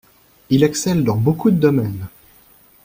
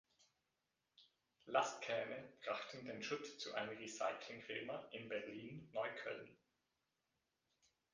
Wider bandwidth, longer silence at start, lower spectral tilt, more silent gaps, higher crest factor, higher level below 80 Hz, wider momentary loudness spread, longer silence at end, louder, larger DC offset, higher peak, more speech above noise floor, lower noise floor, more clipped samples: first, 16.5 kHz vs 9.6 kHz; second, 0.5 s vs 1 s; first, -6.5 dB/octave vs -3 dB/octave; neither; second, 16 dB vs 28 dB; first, -48 dBFS vs -88 dBFS; about the same, 12 LU vs 10 LU; second, 0.75 s vs 1.6 s; first, -17 LUFS vs -46 LUFS; neither; first, -2 dBFS vs -22 dBFS; second, 34 dB vs 43 dB; second, -50 dBFS vs -89 dBFS; neither